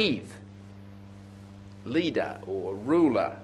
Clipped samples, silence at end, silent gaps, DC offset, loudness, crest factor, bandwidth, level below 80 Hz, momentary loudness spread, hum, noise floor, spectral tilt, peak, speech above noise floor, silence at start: under 0.1%; 0 s; none; under 0.1%; -28 LUFS; 18 dB; 11 kHz; -58 dBFS; 24 LU; none; -46 dBFS; -6.5 dB/octave; -12 dBFS; 19 dB; 0 s